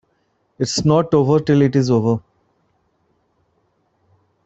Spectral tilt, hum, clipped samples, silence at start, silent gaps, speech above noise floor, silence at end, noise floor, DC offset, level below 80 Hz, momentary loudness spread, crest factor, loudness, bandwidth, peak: -6.5 dB/octave; none; under 0.1%; 0.6 s; none; 50 dB; 2.25 s; -65 dBFS; under 0.1%; -52 dBFS; 7 LU; 16 dB; -17 LUFS; 8.2 kHz; -2 dBFS